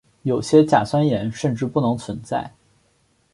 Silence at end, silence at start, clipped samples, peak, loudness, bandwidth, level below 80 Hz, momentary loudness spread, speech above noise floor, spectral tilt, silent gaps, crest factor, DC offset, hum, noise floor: 0.85 s; 0.25 s; under 0.1%; -2 dBFS; -20 LUFS; 11.5 kHz; -54 dBFS; 12 LU; 43 dB; -7 dB/octave; none; 18 dB; under 0.1%; none; -63 dBFS